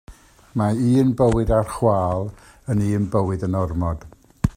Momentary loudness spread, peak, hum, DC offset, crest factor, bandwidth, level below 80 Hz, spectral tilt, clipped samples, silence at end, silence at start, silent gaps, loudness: 10 LU; -4 dBFS; none; under 0.1%; 18 dB; 15 kHz; -36 dBFS; -8.5 dB/octave; under 0.1%; 0.05 s; 0.1 s; none; -21 LUFS